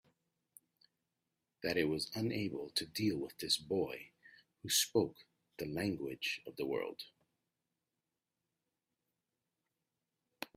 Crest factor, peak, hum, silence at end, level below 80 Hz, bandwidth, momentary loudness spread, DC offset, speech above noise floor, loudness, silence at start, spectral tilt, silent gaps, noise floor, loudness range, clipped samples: 24 dB; -18 dBFS; none; 0.1 s; -74 dBFS; 16 kHz; 16 LU; under 0.1%; over 52 dB; -37 LUFS; 1.6 s; -3.5 dB/octave; none; under -90 dBFS; 9 LU; under 0.1%